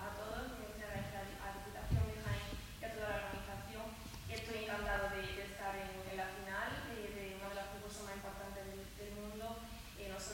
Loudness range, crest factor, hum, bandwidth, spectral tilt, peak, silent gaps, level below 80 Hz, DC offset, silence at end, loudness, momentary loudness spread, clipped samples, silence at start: 3 LU; 20 dB; none; 17 kHz; -4.5 dB/octave; -24 dBFS; none; -52 dBFS; under 0.1%; 0 s; -45 LUFS; 9 LU; under 0.1%; 0 s